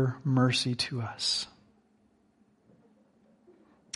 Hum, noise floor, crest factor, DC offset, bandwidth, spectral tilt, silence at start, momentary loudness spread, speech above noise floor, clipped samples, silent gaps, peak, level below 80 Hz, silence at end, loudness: none; -67 dBFS; 18 dB; under 0.1%; 11.5 kHz; -4.5 dB/octave; 0 s; 7 LU; 38 dB; under 0.1%; none; -14 dBFS; -68 dBFS; 2.45 s; -29 LUFS